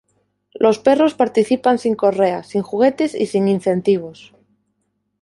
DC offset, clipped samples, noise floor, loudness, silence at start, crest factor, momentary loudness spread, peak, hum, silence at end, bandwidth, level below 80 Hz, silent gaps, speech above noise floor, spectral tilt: under 0.1%; under 0.1%; -70 dBFS; -17 LUFS; 0.6 s; 16 dB; 6 LU; -2 dBFS; none; 1.1 s; 11.5 kHz; -62 dBFS; none; 54 dB; -6.5 dB/octave